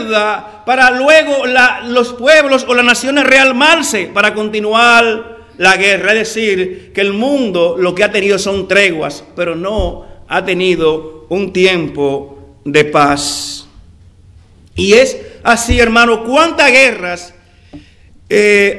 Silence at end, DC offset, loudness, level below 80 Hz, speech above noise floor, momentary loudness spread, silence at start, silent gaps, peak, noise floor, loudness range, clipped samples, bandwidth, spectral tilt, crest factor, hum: 0 s; under 0.1%; -10 LUFS; -34 dBFS; 31 dB; 12 LU; 0 s; none; 0 dBFS; -41 dBFS; 6 LU; 1%; 12 kHz; -3.5 dB/octave; 12 dB; none